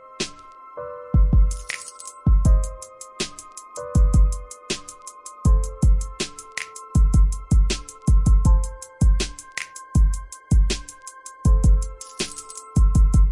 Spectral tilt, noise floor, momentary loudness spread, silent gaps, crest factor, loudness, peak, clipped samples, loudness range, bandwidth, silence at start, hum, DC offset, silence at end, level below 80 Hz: -5.5 dB/octave; -42 dBFS; 17 LU; none; 12 dB; -22 LUFS; -8 dBFS; under 0.1%; 2 LU; 11.5 kHz; 0.2 s; none; under 0.1%; 0 s; -20 dBFS